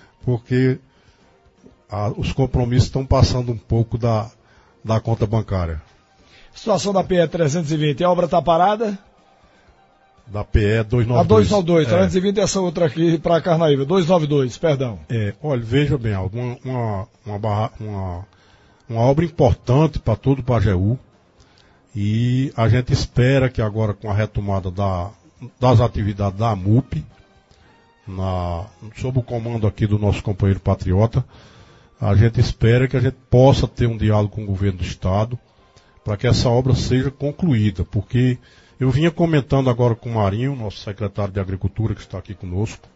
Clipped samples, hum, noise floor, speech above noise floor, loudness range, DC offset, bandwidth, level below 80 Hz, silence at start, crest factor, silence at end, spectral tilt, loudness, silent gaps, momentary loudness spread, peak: under 0.1%; none; -54 dBFS; 36 dB; 6 LU; under 0.1%; 8 kHz; -36 dBFS; 0.25 s; 18 dB; 0.2 s; -7 dB/octave; -19 LUFS; none; 11 LU; -2 dBFS